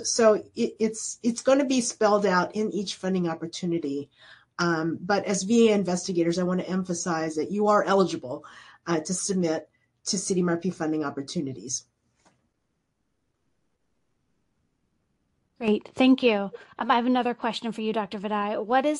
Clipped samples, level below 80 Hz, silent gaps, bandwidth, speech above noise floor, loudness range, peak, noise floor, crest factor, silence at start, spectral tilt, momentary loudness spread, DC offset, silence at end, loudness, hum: under 0.1%; -68 dBFS; none; 11.5 kHz; 51 dB; 9 LU; -6 dBFS; -76 dBFS; 20 dB; 0 s; -4.5 dB/octave; 11 LU; under 0.1%; 0 s; -26 LUFS; none